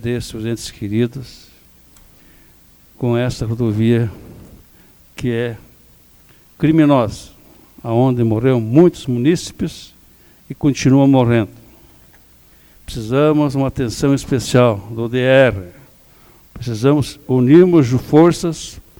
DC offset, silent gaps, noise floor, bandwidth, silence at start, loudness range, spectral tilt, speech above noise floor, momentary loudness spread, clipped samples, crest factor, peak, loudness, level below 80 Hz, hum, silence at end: under 0.1%; none; -48 dBFS; over 20 kHz; 0 s; 7 LU; -7 dB/octave; 33 dB; 15 LU; under 0.1%; 16 dB; 0 dBFS; -15 LUFS; -42 dBFS; none; 0.2 s